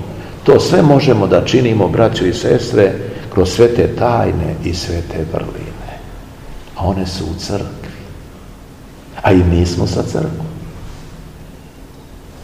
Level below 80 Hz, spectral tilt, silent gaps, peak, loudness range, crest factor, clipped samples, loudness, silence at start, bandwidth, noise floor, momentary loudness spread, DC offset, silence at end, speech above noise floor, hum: -32 dBFS; -6.5 dB/octave; none; 0 dBFS; 11 LU; 16 dB; 0.3%; -14 LUFS; 0 s; 15.5 kHz; -36 dBFS; 23 LU; 0.3%; 0 s; 23 dB; none